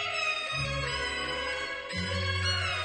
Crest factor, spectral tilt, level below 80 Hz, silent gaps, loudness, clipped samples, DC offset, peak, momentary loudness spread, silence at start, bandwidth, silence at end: 14 dB; -3.5 dB/octave; -48 dBFS; none; -30 LUFS; under 0.1%; under 0.1%; -18 dBFS; 5 LU; 0 s; 9.8 kHz; 0 s